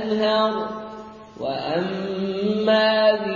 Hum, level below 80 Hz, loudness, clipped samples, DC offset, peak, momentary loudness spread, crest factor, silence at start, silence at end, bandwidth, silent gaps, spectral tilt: none; -62 dBFS; -22 LUFS; under 0.1%; under 0.1%; -6 dBFS; 17 LU; 16 dB; 0 s; 0 s; 7.2 kHz; none; -6.5 dB/octave